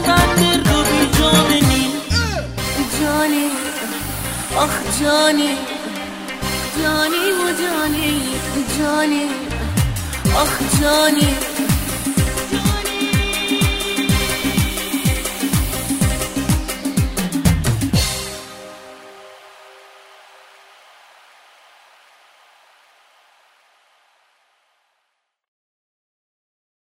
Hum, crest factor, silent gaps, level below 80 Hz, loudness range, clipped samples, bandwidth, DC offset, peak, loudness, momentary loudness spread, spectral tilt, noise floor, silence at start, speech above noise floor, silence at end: none; 20 dB; none; -30 dBFS; 4 LU; under 0.1%; 16.5 kHz; under 0.1%; 0 dBFS; -17 LUFS; 10 LU; -4 dB/octave; -72 dBFS; 0 s; 55 dB; 7.15 s